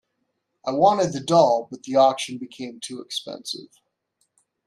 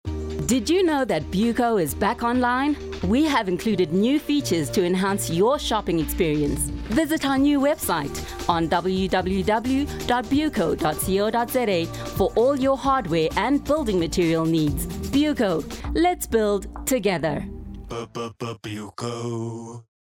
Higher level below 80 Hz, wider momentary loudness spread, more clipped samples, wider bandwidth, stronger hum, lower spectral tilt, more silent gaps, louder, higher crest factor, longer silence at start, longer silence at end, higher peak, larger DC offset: second, -68 dBFS vs -40 dBFS; first, 16 LU vs 10 LU; neither; second, 13 kHz vs 17 kHz; neither; about the same, -4.5 dB/octave vs -5 dB/octave; neither; about the same, -21 LUFS vs -23 LUFS; about the same, 20 dB vs 18 dB; first, 0.65 s vs 0.05 s; first, 1 s vs 0.35 s; about the same, -4 dBFS vs -6 dBFS; neither